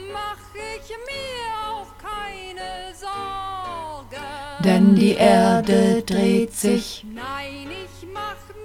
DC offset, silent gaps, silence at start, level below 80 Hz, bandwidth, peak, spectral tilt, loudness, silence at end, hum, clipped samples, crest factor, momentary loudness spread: under 0.1%; none; 0 s; -46 dBFS; 15.5 kHz; -2 dBFS; -6 dB/octave; -20 LUFS; 0 s; none; under 0.1%; 20 dB; 19 LU